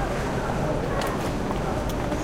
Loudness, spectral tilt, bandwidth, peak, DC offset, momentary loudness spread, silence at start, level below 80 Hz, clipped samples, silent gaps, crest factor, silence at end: -27 LUFS; -6 dB/octave; 17 kHz; -12 dBFS; under 0.1%; 1 LU; 0 s; -34 dBFS; under 0.1%; none; 12 dB; 0 s